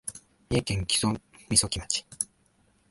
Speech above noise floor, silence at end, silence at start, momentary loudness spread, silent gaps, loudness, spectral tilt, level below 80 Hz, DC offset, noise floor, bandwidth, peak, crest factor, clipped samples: 39 dB; 0.65 s; 0.05 s; 11 LU; none; -27 LUFS; -3 dB/octave; -46 dBFS; under 0.1%; -66 dBFS; 12 kHz; -6 dBFS; 24 dB; under 0.1%